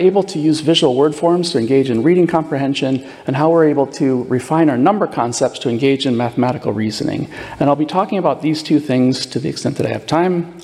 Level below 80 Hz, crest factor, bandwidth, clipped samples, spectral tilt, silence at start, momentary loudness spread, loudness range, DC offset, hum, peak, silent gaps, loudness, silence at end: -54 dBFS; 14 dB; 12.5 kHz; under 0.1%; -6 dB/octave; 0 s; 7 LU; 3 LU; under 0.1%; none; -2 dBFS; none; -16 LUFS; 0 s